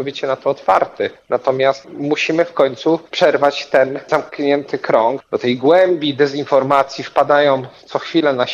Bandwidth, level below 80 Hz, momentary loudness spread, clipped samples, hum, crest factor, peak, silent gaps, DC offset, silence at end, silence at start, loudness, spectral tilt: 7.6 kHz; -62 dBFS; 7 LU; under 0.1%; none; 14 dB; -2 dBFS; none; under 0.1%; 0 s; 0 s; -16 LUFS; -5.5 dB/octave